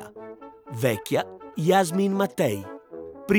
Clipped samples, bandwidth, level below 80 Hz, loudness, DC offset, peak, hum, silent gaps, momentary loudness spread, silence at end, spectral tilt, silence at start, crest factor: under 0.1%; 19.5 kHz; -60 dBFS; -25 LUFS; under 0.1%; -8 dBFS; none; none; 20 LU; 0 s; -5.5 dB/octave; 0 s; 18 dB